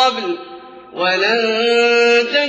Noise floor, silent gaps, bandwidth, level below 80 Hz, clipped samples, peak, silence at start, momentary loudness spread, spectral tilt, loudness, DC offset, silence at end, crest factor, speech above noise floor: -36 dBFS; none; 8.4 kHz; -70 dBFS; under 0.1%; -2 dBFS; 0 s; 16 LU; -2.5 dB/octave; -14 LUFS; under 0.1%; 0 s; 14 dB; 21 dB